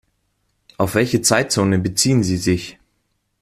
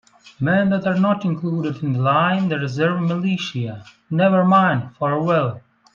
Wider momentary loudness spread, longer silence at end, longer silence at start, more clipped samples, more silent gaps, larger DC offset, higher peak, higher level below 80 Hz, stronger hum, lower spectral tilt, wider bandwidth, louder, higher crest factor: about the same, 8 LU vs 10 LU; first, 0.7 s vs 0.35 s; first, 0.8 s vs 0.25 s; neither; neither; neither; first, 0 dBFS vs -4 dBFS; first, -50 dBFS vs -60 dBFS; neither; second, -4.5 dB/octave vs -7.5 dB/octave; first, 15.5 kHz vs 7.2 kHz; about the same, -18 LUFS vs -19 LUFS; about the same, 18 dB vs 16 dB